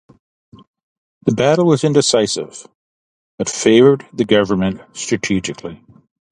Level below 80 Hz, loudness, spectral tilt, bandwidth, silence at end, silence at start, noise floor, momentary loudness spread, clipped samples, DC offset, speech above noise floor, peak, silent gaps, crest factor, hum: -50 dBFS; -16 LUFS; -5 dB/octave; 11 kHz; 0.55 s; 1.25 s; under -90 dBFS; 15 LU; under 0.1%; under 0.1%; over 75 dB; 0 dBFS; 2.75-3.38 s; 18 dB; none